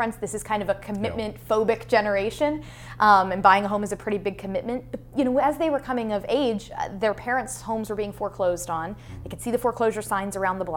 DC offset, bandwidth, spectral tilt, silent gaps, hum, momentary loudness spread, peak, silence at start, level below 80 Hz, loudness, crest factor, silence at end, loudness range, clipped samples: under 0.1%; 18 kHz; -5 dB/octave; none; none; 13 LU; -2 dBFS; 0 s; -48 dBFS; -25 LUFS; 22 dB; 0 s; 5 LU; under 0.1%